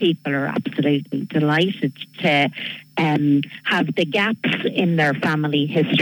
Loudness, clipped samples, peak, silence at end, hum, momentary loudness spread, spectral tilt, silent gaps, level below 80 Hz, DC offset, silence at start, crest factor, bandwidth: -20 LUFS; under 0.1%; -6 dBFS; 0 s; none; 5 LU; -7 dB/octave; none; -68 dBFS; under 0.1%; 0 s; 14 dB; 19 kHz